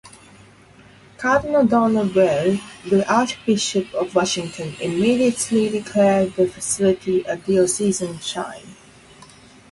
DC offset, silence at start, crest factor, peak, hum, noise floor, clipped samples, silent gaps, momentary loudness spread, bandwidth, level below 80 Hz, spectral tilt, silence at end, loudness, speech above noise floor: under 0.1%; 0.05 s; 16 dB; -4 dBFS; none; -48 dBFS; under 0.1%; none; 9 LU; 11.5 kHz; -54 dBFS; -4.5 dB/octave; 1 s; -20 LUFS; 29 dB